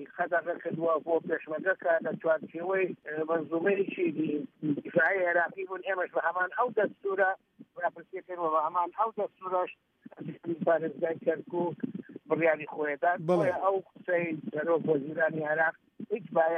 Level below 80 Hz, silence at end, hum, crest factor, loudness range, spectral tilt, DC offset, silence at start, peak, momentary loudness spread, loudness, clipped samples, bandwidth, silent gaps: -82 dBFS; 0 s; none; 16 dB; 3 LU; -8.5 dB/octave; under 0.1%; 0 s; -14 dBFS; 9 LU; -30 LUFS; under 0.1%; 8.8 kHz; none